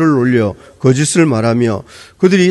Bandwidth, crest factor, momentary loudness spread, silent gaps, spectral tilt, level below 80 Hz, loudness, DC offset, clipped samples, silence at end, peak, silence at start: 12 kHz; 12 dB; 6 LU; none; -6 dB/octave; -50 dBFS; -13 LUFS; under 0.1%; 0.1%; 0 s; 0 dBFS; 0 s